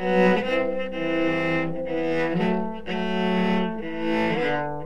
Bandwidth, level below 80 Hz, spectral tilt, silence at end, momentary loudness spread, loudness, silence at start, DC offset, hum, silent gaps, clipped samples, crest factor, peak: 9.4 kHz; -50 dBFS; -7 dB/octave; 0 s; 7 LU; -24 LUFS; 0 s; 2%; none; none; under 0.1%; 16 dB; -8 dBFS